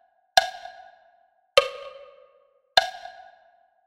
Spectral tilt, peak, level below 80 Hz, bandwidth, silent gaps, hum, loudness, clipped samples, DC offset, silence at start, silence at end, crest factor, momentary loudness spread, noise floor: 0.5 dB/octave; 0 dBFS; -60 dBFS; 16 kHz; none; none; -23 LUFS; under 0.1%; under 0.1%; 0.35 s; 0.75 s; 28 dB; 21 LU; -63 dBFS